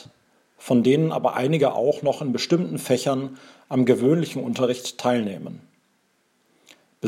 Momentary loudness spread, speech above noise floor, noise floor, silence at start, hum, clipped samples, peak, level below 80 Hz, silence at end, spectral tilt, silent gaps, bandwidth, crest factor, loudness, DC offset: 9 LU; 45 dB; -66 dBFS; 0.6 s; none; under 0.1%; -4 dBFS; -74 dBFS; 0 s; -6 dB/octave; none; 14.5 kHz; 20 dB; -22 LUFS; under 0.1%